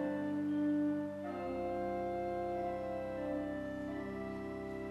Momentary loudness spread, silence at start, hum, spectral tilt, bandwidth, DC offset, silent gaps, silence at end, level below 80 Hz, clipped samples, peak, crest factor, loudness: 8 LU; 0 s; none; -8 dB/octave; 9.4 kHz; under 0.1%; none; 0 s; -60 dBFS; under 0.1%; -26 dBFS; 12 dB; -39 LUFS